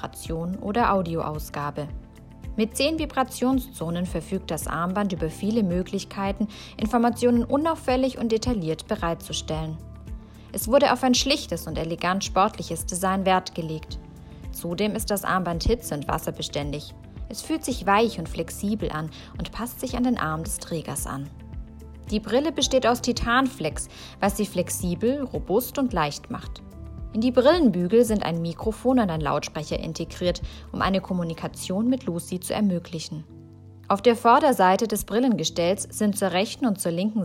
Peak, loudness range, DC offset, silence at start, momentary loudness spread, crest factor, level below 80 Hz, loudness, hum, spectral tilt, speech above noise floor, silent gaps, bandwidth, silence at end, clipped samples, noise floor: -6 dBFS; 5 LU; under 0.1%; 0 s; 15 LU; 20 dB; -42 dBFS; -25 LUFS; none; -5 dB/octave; 21 dB; none; 16 kHz; 0 s; under 0.1%; -45 dBFS